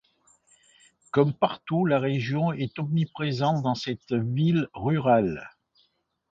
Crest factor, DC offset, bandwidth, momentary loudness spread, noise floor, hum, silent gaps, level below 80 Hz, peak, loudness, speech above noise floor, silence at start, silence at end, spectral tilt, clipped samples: 20 dB; under 0.1%; 7.8 kHz; 6 LU; -70 dBFS; none; none; -60 dBFS; -8 dBFS; -26 LUFS; 45 dB; 1.15 s; 0.85 s; -8 dB/octave; under 0.1%